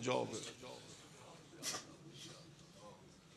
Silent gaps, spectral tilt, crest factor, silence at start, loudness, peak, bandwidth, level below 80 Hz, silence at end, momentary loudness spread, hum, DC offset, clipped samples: none; -3 dB/octave; 24 dB; 0 s; -47 LUFS; -24 dBFS; 13 kHz; -80 dBFS; 0 s; 17 LU; none; under 0.1%; under 0.1%